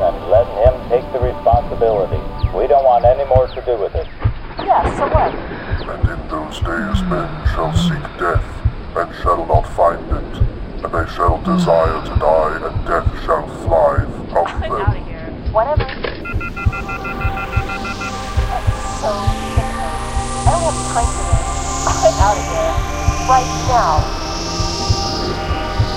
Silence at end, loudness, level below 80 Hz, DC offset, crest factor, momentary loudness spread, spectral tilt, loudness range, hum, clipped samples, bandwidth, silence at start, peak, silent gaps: 0 s; -18 LUFS; -24 dBFS; under 0.1%; 16 dB; 8 LU; -5.5 dB/octave; 5 LU; none; under 0.1%; 15.5 kHz; 0 s; 0 dBFS; none